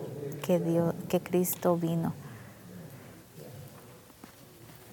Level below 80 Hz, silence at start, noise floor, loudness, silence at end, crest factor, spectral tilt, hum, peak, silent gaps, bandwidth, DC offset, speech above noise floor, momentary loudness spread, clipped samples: -68 dBFS; 0 s; -52 dBFS; -30 LUFS; 0 s; 20 dB; -6.5 dB/octave; none; -12 dBFS; none; 19 kHz; under 0.1%; 24 dB; 23 LU; under 0.1%